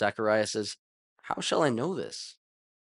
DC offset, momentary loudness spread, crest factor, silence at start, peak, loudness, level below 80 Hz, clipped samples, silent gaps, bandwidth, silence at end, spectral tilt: under 0.1%; 14 LU; 20 dB; 0 s; -12 dBFS; -29 LUFS; -74 dBFS; under 0.1%; 0.79-1.16 s; 11.5 kHz; 0.5 s; -4 dB/octave